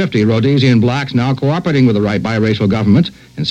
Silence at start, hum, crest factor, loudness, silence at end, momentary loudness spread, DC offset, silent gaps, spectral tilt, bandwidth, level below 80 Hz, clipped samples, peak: 0 s; none; 12 dB; -13 LUFS; 0 s; 4 LU; under 0.1%; none; -7.5 dB/octave; 8.8 kHz; -44 dBFS; under 0.1%; 0 dBFS